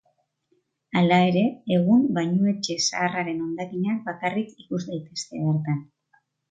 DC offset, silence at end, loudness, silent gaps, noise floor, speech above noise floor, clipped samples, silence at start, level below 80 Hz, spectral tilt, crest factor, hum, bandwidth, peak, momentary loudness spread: under 0.1%; 0.7 s; -24 LUFS; none; -70 dBFS; 47 dB; under 0.1%; 0.95 s; -68 dBFS; -5.5 dB/octave; 18 dB; none; 9.2 kHz; -8 dBFS; 12 LU